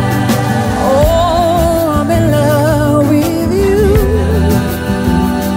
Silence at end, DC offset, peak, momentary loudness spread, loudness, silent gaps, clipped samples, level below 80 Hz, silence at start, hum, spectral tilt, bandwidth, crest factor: 0 s; under 0.1%; 0 dBFS; 3 LU; -12 LUFS; none; under 0.1%; -22 dBFS; 0 s; none; -6.5 dB/octave; 16.5 kHz; 10 dB